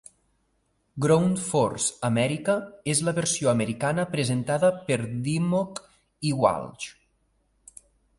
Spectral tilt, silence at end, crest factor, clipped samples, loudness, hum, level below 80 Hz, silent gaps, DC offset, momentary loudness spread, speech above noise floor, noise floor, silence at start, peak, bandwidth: -5 dB/octave; 1.25 s; 20 dB; under 0.1%; -25 LUFS; none; -60 dBFS; none; under 0.1%; 10 LU; 46 dB; -71 dBFS; 0.95 s; -8 dBFS; 11.5 kHz